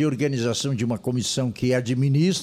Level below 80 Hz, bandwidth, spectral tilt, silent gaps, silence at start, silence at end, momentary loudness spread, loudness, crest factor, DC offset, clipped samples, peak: -56 dBFS; 15 kHz; -5.5 dB/octave; none; 0 s; 0 s; 5 LU; -23 LUFS; 12 dB; under 0.1%; under 0.1%; -10 dBFS